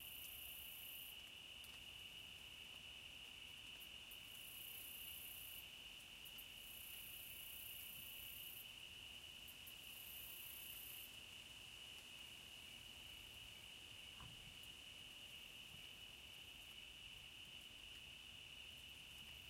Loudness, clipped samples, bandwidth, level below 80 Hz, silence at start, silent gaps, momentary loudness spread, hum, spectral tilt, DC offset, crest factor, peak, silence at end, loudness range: -54 LUFS; under 0.1%; 16 kHz; -74 dBFS; 0 s; none; 4 LU; none; -0.5 dB/octave; under 0.1%; 16 dB; -40 dBFS; 0 s; 3 LU